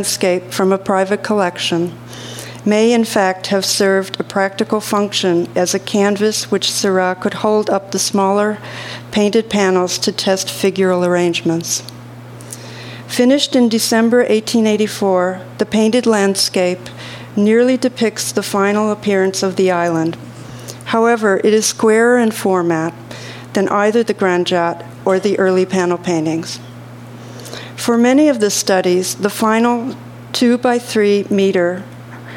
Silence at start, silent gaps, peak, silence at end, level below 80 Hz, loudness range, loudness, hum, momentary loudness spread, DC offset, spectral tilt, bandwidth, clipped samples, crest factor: 0 s; none; 0 dBFS; 0 s; -58 dBFS; 2 LU; -15 LUFS; none; 16 LU; under 0.1%; -4 dB/octave; 17 kHz; under 0.1%; 16 dB